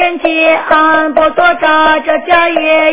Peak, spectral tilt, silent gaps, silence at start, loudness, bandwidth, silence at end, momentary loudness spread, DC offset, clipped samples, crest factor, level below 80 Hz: 0 dBFS; -6.5 dB/octave; none; 0 s; -9 LUFS; 4 kHz; 0 s; 2 LU; 2%; 0.6%; 10 dB; -44 dBFS